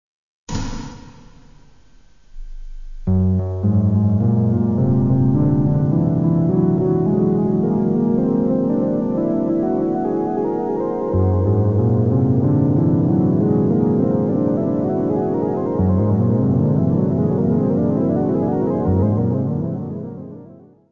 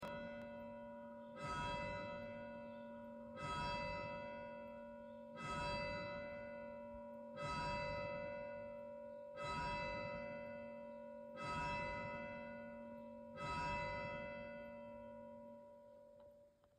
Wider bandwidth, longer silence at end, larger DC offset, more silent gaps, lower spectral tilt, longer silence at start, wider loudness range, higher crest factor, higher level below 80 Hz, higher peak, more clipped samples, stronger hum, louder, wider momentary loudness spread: second, 7.2 kHz vs 10.5 kHz; first, 0.35 s vs 0.05 s; first, 0.4% vs under 0.1%; neither; first, -10.5 dB/octave vs -5.5 dB/octave; first, 0.5 s vs 0 s; about the same, 3 LU vs 2 LU; about the same, 14 dB vs 16 dB; first, -38 dBFS vs -64 dBFS; first, -4 dBFS vs -32 dBFS; neither; neither; first, -18 LUFS vs -48 LUFS; second, 5 LU vs 12 LU